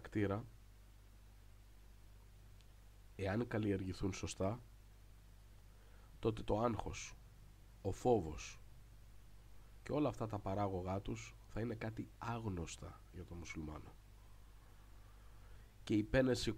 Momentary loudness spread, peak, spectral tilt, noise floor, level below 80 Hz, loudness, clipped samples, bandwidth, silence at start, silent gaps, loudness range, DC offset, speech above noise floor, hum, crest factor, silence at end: 26 LU; -20 dBFS; -6 dB/octave; -61 dBFS; -58 dBFS; -42 LUFS; under 0.1%; 16 kHz; 0 s; none; 8 LU; under 0.1%; 21 dB; 50 Hz at -60 dBFS; 22 dB; 0 s